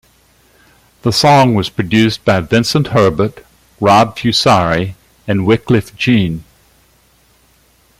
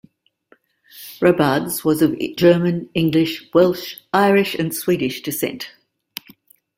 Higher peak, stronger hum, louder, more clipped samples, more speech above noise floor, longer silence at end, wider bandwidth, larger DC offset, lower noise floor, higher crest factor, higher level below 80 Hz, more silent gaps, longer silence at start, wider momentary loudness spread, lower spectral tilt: about the same, 0 dBFS vs -2 dBFS; neither; first, -13 LUFS vs -18 LUFS; neither; about the same, 40 dB vs 39 dB; first, 1.6 s vs 1.1 s; about the same, 16 kHz vs 16.5 kHz; neither; second, -52 dBFS vs -57 dBFS; about the same, 14 dB vs 18 dB; first, -44 dBFS vs -56 dBFS; neither; about the same, 1.05 s vs 0.95 s; second, 10 LU vs 20 LU; about the same, -5.5 dB/octave vs -5.5 dB/octave